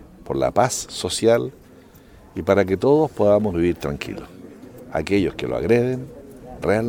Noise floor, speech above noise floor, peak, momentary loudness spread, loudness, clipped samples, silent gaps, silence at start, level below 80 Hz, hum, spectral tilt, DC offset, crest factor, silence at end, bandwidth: -47 dBFS; 27 dB; -2 dBFS; 21 LU; -21 LUFS; under 0.1%; none; 0 s; -46 dBFS; none; -5.5 dB/octave; under 0.1%; 20 dB; 0 s; 19 kHz